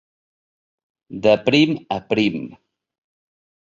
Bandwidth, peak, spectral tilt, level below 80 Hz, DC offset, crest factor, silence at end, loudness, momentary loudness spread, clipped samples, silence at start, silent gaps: 7.4 kHz; -2 dBFS; -6 dB/octave; -58 dBFS; under 0.1%; 20 dB; 1.2 s; -18 LUFS; 18 LU; under 0.1%; 1.1 s; none